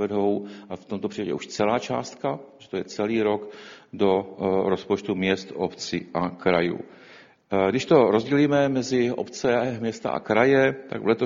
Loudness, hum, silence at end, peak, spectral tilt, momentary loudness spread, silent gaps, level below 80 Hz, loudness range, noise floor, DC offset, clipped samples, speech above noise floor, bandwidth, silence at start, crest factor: -24 LUFS; none; 0 s; -4 dBFS; -6 dB/octave; 13 LU; none; -60 dBFS; 6 LU; -50 dBFS; under 0.1%; under 0.1%; 27 dB; 7.6 kHz; 0 s; 20 dB